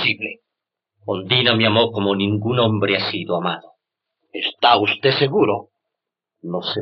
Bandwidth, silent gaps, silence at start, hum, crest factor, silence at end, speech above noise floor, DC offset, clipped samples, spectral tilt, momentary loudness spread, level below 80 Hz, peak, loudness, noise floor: 6 kHz; none; 0 s; none; 18 dB; 0 s; 64 dB; under 0.1%; under 0.1%; -3 dB/octave; 14 LU; -72 dBFS; -2 dBFS; -18 LUFS; -83 dBFS